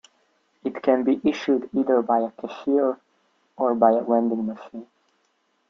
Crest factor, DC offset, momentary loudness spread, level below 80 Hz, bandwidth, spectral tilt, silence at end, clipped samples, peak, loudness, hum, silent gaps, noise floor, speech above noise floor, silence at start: 20 dB; under 0.1%; 14 LU; -68 dBFS; 7.4 kHz; -7 dB/octave; 0.85 s; under 0.1%; -4 dBFS; -23 LUFS; none; none; -69 dBFS; 47 dB; 0.65 s